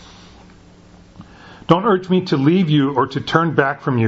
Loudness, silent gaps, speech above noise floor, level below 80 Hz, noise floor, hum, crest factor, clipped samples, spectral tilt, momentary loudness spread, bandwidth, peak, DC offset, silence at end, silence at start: -17 LUFS; none; 29 dB; -52 dBFS; -45 dBFS; none; 18 dB; under 0.1%; -7.5 dB/octave; 3 LU; 7.8 kHz; 0 dBFS; under 0.1%; 0 s; 1.2 s